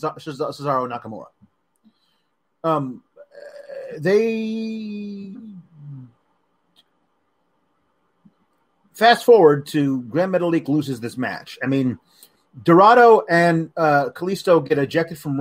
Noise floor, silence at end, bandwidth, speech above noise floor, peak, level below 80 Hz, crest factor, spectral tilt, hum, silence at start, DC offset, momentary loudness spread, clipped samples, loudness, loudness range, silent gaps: -71 dBFS; 0 s; 16 kHz; 53 dB; -2 dBFS; -68 dBFS; 18 dB; -6.5 dB/octave; none; 0 s; under 0.1%; 23 LU; under 0.1%; -18 LUFS; 13 LU; none